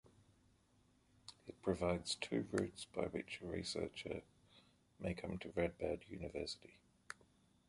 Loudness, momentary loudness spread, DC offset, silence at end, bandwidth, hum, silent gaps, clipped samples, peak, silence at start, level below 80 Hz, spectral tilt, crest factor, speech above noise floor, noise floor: -44 LUFS; 16 LU; under 0.1%; 0.55 s; 11.5 kHz; none; none; under 0.1%; -22 dBFS; 0.05 s; -62 dBFS; -5 dB/octave; 24 dB; 31 dB; -74 dBFS